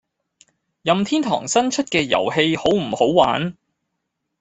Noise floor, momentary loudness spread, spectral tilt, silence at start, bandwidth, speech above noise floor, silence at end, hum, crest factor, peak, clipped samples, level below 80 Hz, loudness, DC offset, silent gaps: -77 dBFS; 5 LU; -4 dB/octave; 0.85 s; 8.4 kHz; 58 dB; 0.9 s; none; 18 dB; -2 dBFS; under 0.1%; -56 dBFS; -19 LUFS; under 0.1%; none